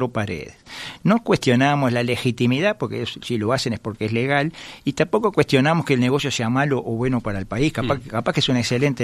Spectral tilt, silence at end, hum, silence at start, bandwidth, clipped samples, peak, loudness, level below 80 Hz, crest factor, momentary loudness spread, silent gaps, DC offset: -5.5 dB/octave; 0 s; none; 0 s; 13.5 kHz; under 0.1%; -2 dBFS; -21 LUFS; -46 dBFS; 18 dB; 9 LU; none; under 0.1%